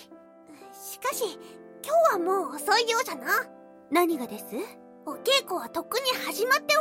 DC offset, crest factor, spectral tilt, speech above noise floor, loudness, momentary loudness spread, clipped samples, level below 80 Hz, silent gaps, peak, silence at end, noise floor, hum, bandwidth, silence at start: under 0.1%; 18 dB; -1.5 dB/octave; 24 dB; -26 LUFS; 18 LU; under 0.1%; -78 dBFS; none; -10 dBFS; 0 s; -51 dBFS; none; 16.5 kHz; 0 s